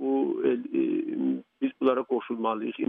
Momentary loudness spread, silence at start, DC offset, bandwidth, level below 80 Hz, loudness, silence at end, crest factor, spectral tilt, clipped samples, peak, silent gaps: 5 LU; 0 s; under 0.1%; 3.8 kHz; -82 dBFS; -28 LUFS; 0.05 s; 16 dB; -9 dB/octave; under 0.1%; -12 dBFS; none